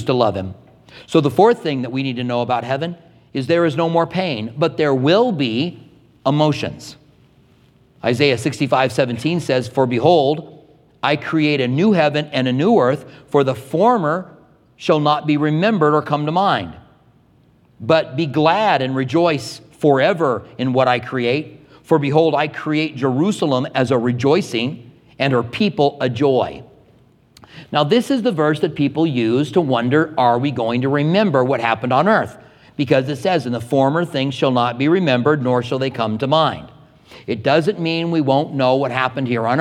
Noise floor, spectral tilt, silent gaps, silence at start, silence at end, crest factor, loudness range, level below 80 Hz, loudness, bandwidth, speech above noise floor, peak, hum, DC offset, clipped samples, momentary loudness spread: -53 dBFS; -6.5 dB/octave; none; 0 s; 0 s; 18 dB; 3 LU; -58 dBFS; -17 LUFS; 13.5 kHz; 36 dB; 0 dBFS; none; under 0.1%; under 0.1%; 8 LU